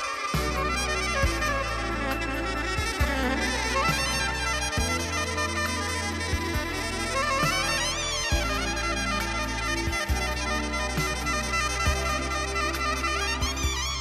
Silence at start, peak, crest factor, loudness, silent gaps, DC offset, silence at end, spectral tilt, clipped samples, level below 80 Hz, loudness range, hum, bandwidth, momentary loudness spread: 0 s; -10 dBFS; 16 dB; -26 LUFS; none; under 0.1%; 0 s; -3 dB/octave; under 0.1%; -34 dBFS; 1 LU; none; 14 kHz; 4 LU